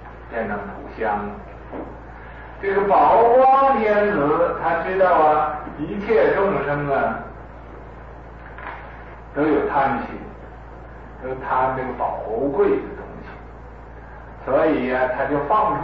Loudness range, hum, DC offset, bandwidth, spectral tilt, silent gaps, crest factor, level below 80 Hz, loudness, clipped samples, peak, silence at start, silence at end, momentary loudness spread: 9 LU; none; 0.2%; 5.6 kHz; -9 dB/octave; none; 14 dB; -42 dBFS; -19 LUFS; under 0.1%; -8 dBFS; 0 s; 0 s; 24 LU